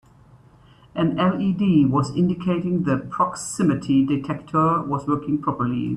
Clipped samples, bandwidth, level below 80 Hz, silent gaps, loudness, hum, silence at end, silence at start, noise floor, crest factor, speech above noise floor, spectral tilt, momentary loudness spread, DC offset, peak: under 0.1%; 11 kHz; -52 dBFS; none; -22 LUFS; none; 0 s; 0.95 s; -51 dBFS; 14 dB; 30 dB; -7 dB/octave; 6 LU; under 0.1%; -6 dBFS